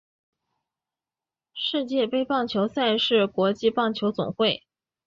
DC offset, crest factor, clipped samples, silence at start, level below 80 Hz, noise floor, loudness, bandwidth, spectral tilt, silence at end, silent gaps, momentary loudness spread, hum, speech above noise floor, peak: under 0.1%; 16 dB; under 0.1%; 1.55 s; -66 dBFS; under -90 dBFS; -24 LUFS; 7.4 kHz; -6 dB/octave; 0.5 s; none; 6 LU; none; over 66 dB; -10 dBFS